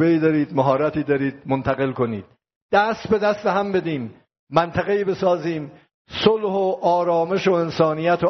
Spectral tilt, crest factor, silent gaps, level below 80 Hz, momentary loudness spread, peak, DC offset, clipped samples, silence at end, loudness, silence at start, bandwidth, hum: -5 dB/octave; 18 dB; 2.56-2.69 s, 4.39-4.47 s, 5.94-6.05 s; -54 dBFS; 8 LU; -2 dBFS; under 0.1%; under 0.1%; 0 s; -21 LUFS; 0 s; 6.4 kHz; none